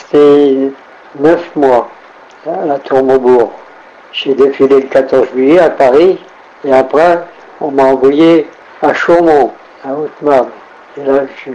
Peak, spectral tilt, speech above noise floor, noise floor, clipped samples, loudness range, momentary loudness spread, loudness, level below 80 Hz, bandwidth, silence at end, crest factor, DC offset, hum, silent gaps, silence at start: 0 dBFS; -6.5 dB/octave; 27 dB; -36 dBFS; under 0.1%; 3 LU; 14 LU; -10 LUFS; -48 dBFS; 8.8 kHz; 0 s; 10 dB; under 0.1%; none; none; 0.15 s